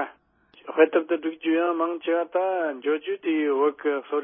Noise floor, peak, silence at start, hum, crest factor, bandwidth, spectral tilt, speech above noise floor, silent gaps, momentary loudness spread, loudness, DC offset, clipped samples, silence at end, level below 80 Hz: -58 dBFS; -4 dBFS; 0 s; none; 20 dB; 3.7 kHz; -8 dB/octave; 34 dB; none; 7 LU; -25 LUFS; under 0.1%; under 0.1%; 0 s; -82 dBFS